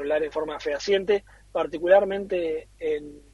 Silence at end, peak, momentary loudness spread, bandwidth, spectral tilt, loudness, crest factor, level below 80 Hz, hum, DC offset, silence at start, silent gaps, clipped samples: 0.15 s; -4 dBFS; 11 LU; 11 kHz; -4.5 dB/octave; -25 LUFS; 20 dB; -54 dBFS; none; under 0.1%; 0 s; none; under 0.1%